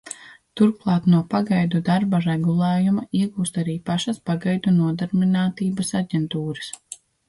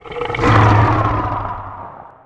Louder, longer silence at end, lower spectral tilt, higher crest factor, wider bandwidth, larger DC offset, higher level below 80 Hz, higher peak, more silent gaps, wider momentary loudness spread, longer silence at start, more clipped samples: second, -21 LUFS vs -15 LUFS; first, 0.35 s vs 0.2 s; about the same, -6.5 dB/octave vs -7.5 dB/octave; about the same, 14 dB vs 16 dB; first, 11.5 kHz vs 7.8 kHz; neither; second, -58 dBFS vs -30 dBFS; second, -6 dBFS vs 0 dBFS; neither; second, 11 LU vs 21 LU; about the same, 0.05 s vs 0.05 s; neither